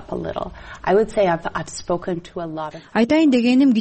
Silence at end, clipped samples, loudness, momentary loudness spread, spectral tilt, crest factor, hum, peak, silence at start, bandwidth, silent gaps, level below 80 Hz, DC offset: 0 s; under 0.1%; -20 LUFS; 14 LU; -6 dB/octave; 12 dB; none; -6 dBFS; 0 s; 8.8 kHz; none; -46 dBFS; under 0.1%